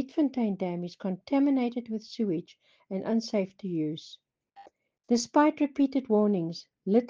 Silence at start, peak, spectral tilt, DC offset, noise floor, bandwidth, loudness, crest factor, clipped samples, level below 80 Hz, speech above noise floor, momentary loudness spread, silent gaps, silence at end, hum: 0 s; -10 dBFS; -6 dB/octave; under 0.1%; -56 dBFS; 7.6 kHz; -29 LUFS; 18 dB; under 0.1%; -76 dBFS; 28 dB; 11 LU; none; 0 s; none